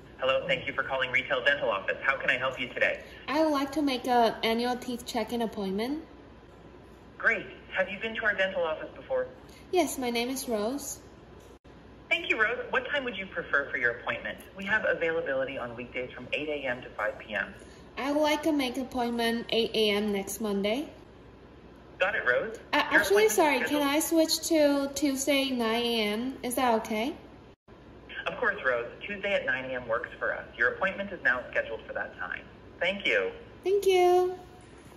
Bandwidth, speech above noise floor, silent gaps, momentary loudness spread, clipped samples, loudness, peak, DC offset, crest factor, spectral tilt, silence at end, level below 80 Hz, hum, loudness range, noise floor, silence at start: 15.5 kHz; 22 dB; 11.59-11.64 s, 27.56-27.66 s; 11 LU; under 0.1%; -28 LUFS; -10 dBFS; under 0.1%; 20 dB; -3 dB/octave; 0 s; -58 dBFS; none; 6 LU; -51 dBFS; 0 s